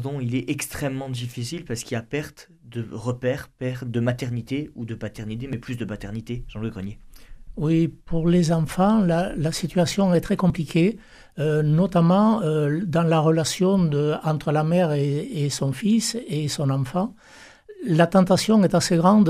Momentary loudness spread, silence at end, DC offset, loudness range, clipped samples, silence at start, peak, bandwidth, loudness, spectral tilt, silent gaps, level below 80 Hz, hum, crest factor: 14 LU; 0 s; under 0.1%; 9 LU; under 0.1%; 0 s; -6 dBFS; 14.5 kHz; -23 LUFS; -6.5 dB/octave; none; -46 dBFS; none; 16 dB